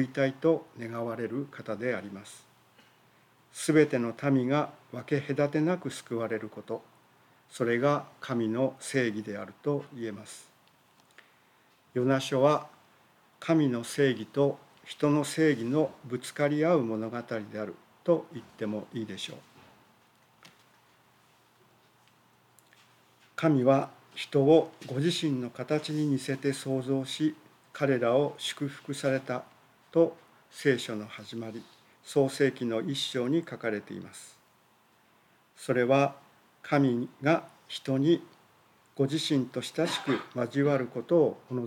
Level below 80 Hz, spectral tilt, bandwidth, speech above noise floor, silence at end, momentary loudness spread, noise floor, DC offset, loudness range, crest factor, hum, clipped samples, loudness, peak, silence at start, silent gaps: -84 dBFS; -6 dB/octave; 16.5 kHz; 36 dB; 0 s; 14 LU; -65 dBFS; under 0.1%; 7 LU; 20 dB; none; under 0.1%; -29 LUFS; -10 dBFS; 0 s; none